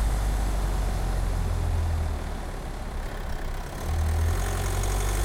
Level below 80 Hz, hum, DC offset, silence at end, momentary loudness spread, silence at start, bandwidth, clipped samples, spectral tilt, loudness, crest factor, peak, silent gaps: -28 dBFS; none; under 0.1%; 0 s; 8 LU; 0 s; 16.5 kHz; under 0.1%; -5 dB/octave; -30 LUFS; 10 dB; -16 dBFS; none